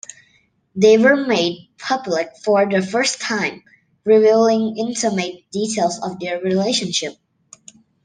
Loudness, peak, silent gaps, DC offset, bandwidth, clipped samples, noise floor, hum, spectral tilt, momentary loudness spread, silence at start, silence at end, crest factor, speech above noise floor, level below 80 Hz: -18 LUFS; -2 dBFS; none; under 0.1%; 10 kHz; under 0.1%; -60 dBFS; none; -4 dB/octave; 12 LU; 0.75 s; 0.9 s; 18 dB; 42 dB; -66 dBFS